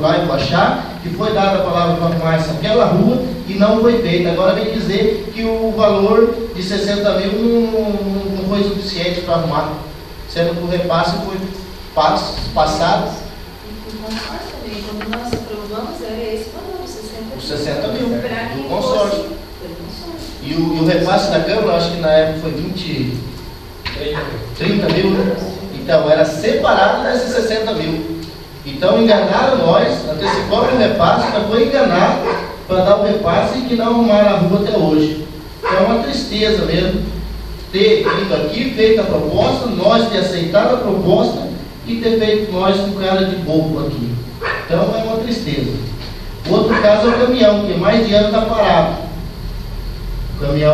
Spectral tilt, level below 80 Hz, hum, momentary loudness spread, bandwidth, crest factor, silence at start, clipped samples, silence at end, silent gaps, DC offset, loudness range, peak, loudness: -6 dB/octave; -34 dBFS; none; 15 LU; 14 kHz; 16 dB; 0 s; under 0.1%; 0 s; none; under 0.1%; 7 LU; 0 dBFS; -15 LUFS